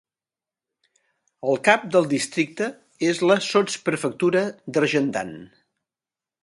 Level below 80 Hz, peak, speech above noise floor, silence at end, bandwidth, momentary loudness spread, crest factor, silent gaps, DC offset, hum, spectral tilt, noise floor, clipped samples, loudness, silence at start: -68 dBFS; 0 dBFS; over 68 dB; 0.95 s; 11.5 kHz; 11 LU; 24 dB; none; under 0.1%; none; -4.5 dB/octave; under -90 dBFS; under 0.1%; -22 LUFS; 1.45 s